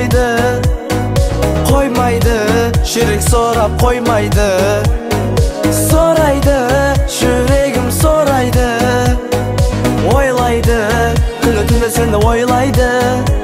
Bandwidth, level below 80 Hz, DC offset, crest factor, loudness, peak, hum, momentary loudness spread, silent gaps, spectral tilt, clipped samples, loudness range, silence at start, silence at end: 16.5 kHz; -18 dBFS; under 0.1%; 12 dB; -12 LUFS; 0 dBFS; none; 3 LU; none; -5.5 dB/octave; under 0.1%; 1 LU; 0 s; 0 s